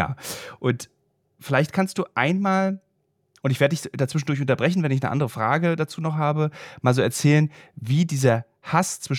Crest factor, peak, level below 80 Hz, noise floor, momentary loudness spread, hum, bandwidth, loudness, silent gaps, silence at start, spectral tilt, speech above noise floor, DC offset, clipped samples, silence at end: 20 dB; -4 dBFS; -62 dBFS; -70 dBFS; 8 LU; none; 16.5 kHz; -23 LUFS; none; 0 s; -6 dB/octave; 48 dB; under 0.1%; under 0.1%; 0 s